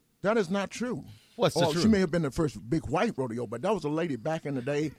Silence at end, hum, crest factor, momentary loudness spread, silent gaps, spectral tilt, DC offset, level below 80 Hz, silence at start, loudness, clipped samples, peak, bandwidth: 0.05 s; none; 16 dB; 9 LU; none; -6 dB/octave; under 0.1%; -52 dBFS; 0.25 s; -29 LUFS; under 0.1%; -12 dBFS; 14.5 kHz